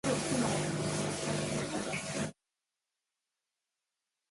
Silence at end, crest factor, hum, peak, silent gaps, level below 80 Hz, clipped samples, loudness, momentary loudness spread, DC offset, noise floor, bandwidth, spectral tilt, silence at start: 2 s; 18 dB; none; -20 dBFS; none; -62 dBFS; under 0.1%; -34 LUFS; 6 LU; under 0.1%; -89 dBFS; 11.5 kHz; -4 dB/octave; 0.05 s